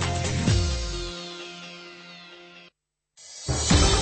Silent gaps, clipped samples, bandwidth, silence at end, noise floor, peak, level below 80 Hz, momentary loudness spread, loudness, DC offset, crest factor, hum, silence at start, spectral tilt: none; under 0.1%; 8.8 kHz; 0 s; -67 dBFS; -6 dBFS; -32 dBFS; 23 LU; -25 LUFS; under 0.1%; 20 dB; none; 0 s; -4 dB/octave